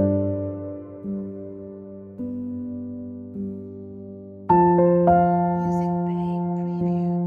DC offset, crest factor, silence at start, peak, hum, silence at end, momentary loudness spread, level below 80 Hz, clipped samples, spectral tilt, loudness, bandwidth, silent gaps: under 0.1%; 18 dB; 0 s; -6 dBFS; none; 0 s; 21 LU; -52 dBFS; under 0.1%; -11 dB/octave; -23 LUFS; 3.1 kHz; none